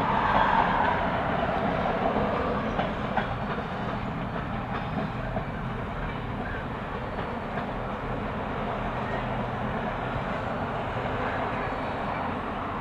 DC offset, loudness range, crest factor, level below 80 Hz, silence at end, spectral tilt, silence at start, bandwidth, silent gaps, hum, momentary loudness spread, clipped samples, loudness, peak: under 0.1%; 6 LU; 18 dB; -42 dBFS; 0 s; -7.5 dB/octave; 0 s; 10.5 kHz; none; none; 9 LU; under 0.1%; -29 LUFS; -10 dBFS